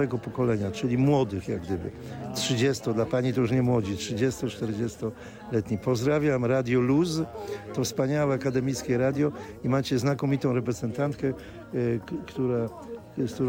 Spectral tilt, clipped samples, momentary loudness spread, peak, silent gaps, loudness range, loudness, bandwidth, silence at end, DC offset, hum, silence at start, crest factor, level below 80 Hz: -6.5 dB/octave; under 0.1%; 10 LU; -12 dBFS; none; 2 LU; -27 LUFS; 16.5 kHz; 0 s; under 0.1%; none; 0 s; 14 dB; -54 dBFS